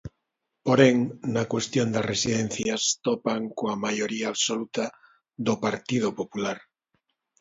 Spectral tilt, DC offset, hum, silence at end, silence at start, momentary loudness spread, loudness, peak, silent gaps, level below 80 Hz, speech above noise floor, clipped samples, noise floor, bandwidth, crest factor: -4 dB/octave; under 0.1%; none; 0.85 s; 0.05 s; 11 LU; -26 LUFS; -4 dBFS; none; -60 dBFS; 55 dB; under 0.1%; -81 dBFS; 8 kHz; 24 dB